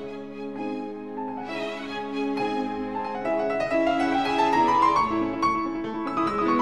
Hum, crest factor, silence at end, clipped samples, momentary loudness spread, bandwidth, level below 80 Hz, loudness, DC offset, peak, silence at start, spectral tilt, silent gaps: none; 16 dB; 0 s; under 0.1%; 13 LU; 11 kHz; -54 dBFS; -26 LUFS; 0.3%; -10 dBFS; 0 s; -5.5 dB/octave; none